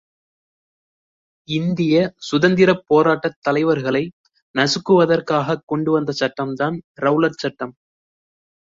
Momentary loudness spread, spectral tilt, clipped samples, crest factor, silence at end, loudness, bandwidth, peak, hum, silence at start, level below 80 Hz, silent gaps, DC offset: 10 LU; -6 dB/octave; under 0.1%; 18 dB; 1 s; -18 LUFS; 7.8 kHz; -2 dBFS; none; 1.5 s; -60 dBFS; 3.36-3.42 s, 4.13-4.24 s, 4.42-4.54 s, 5.63-5.67 s, 6.84-6.95 s; under 0.1%